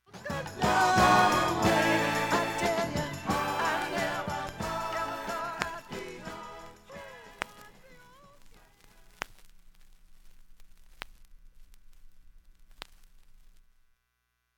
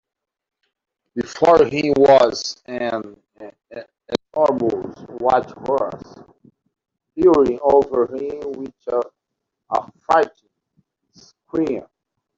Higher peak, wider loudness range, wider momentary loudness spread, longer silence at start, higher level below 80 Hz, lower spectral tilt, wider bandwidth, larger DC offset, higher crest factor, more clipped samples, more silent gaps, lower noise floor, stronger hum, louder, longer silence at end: second, -6 dBFS vs -2 dBFS; first, 24 LU vs 6 LU; first, 24 LU vs 19 LU; second, 0.15 s vs 1.15 s; about the same, -52 dBFS vs -54 dBFS; second, -4 dB/octave vs -5.5 dB/octave; first, 17.5 kHz vs 7.6 kHz; neither; first, 26 dB vs 20 dB; neither; neither; about the same, -79 dBFS vs -80 dBFS; neither; second, -28 LUFS vs -19 LUFS; first, 1.5 s vs 0.55 s